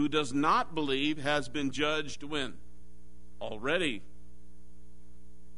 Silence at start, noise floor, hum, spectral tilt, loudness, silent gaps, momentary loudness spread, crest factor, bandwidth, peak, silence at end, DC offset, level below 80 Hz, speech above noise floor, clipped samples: 0 s; -57 dBFS; none; -4 dB/octave; -31 LUFS; none; 11 LU; 20 dB; 10.5 kHz; -14 dBFS; 0.3 s; 2%; -56 dBFS; 25 dB; under 0.1%